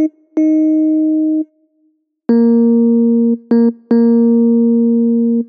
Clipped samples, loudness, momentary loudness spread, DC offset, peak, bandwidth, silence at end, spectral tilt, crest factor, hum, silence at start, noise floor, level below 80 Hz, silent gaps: under 0.1%; -12 LUFS; 6 LU; under 0.1%; -2 dBFS; 4.8 kHz; 0.05 s; -10 dB/octave; 10 dB; none; 0 s; -60 dBFS; -78 dBFS; none